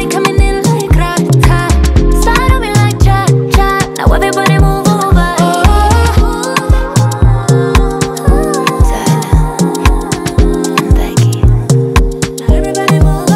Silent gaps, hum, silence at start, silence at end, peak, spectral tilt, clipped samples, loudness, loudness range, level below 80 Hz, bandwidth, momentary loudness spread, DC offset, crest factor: none; none; 0 s; 0 s; 0 dBFS; -5.5 dB/octave; 0.3%; -10 LUFS; 2 LU; -12 dBFS; 15.5 kHz; 4 LU; under 0.1%; 8 dB